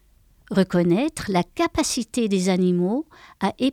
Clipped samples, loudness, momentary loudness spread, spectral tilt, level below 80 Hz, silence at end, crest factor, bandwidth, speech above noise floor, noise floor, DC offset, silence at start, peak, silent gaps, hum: under 0.1%; -22 LUFS; 7 LU; -5.5 dB/octave; -50 dBFS; 0 s; 16 dB; 15 kHz; 33 dB; -55 dBFS; under 0.1%; 0.5 s; -6 dBFS; none; none